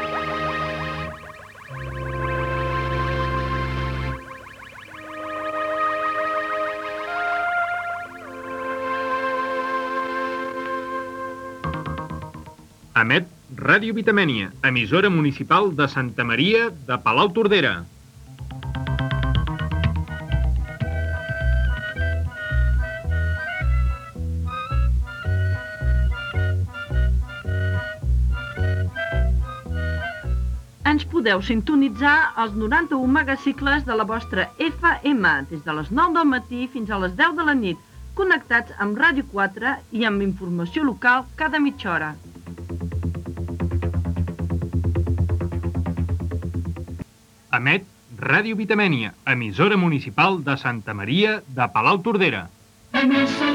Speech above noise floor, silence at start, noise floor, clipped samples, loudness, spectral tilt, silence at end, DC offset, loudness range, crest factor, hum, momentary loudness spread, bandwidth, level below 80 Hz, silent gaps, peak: 30 dB; 0 s; -51 dBFS; under 0.1%; -22 LUFS; -7 dB/octave; 0 s; under 0.1%; 7 LU; 20 dB; none; 13 LU; 12 kHz; -32 dBFS; none; -4 dBFS